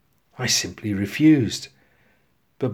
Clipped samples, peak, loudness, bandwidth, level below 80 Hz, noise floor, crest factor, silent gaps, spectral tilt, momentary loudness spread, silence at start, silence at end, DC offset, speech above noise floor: under 0.1%; -6 dBFS; -21 LUFS; 16 kHz; -58 dBFS; -65 dBFS; 18 dB; none; -4 dB/octave; 13 LU; 0.4 s; 0 s; under 0.1%; 45 dB